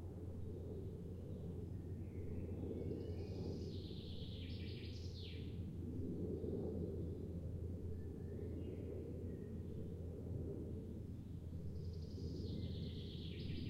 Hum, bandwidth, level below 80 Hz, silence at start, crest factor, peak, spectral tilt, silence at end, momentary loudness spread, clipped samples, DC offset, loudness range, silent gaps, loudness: none; 9.8 kHz; -58 dBFS; 0 s; 14 dB; -32 dBFS; -8.5 dB/octave; 0 s; 4 LU; under 0.1%; under 0.1%; 2 LU; none; -48 LUFS